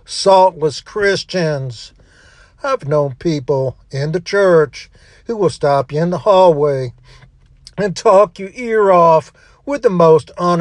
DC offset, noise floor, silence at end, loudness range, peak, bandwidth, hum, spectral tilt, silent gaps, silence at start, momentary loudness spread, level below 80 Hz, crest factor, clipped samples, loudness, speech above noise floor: under 0.1%; -46 dBFS; 0 s; 5 LU; 0 dBFS; 10.5 kHz; none; -6 dB/octave; none; 0.1 s; 14 LU; -48 dBFS; 14 dB; under 0.1%; -14 LUFS; 32 dB